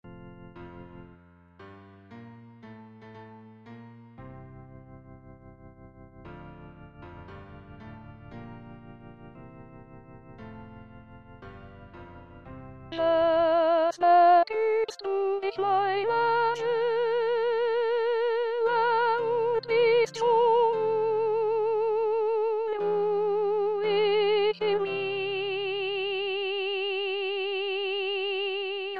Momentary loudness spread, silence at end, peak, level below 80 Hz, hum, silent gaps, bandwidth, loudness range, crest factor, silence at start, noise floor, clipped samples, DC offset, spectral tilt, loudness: 25 LU; 0 s; -10 dBFS; -60 dBFS; none; none; 7.6 kHz; 24 LU; 18 dB; 0.05 s; -55 dBFS; under 0.1%; under 0.1%; -5 dB/octave; -26 LUFS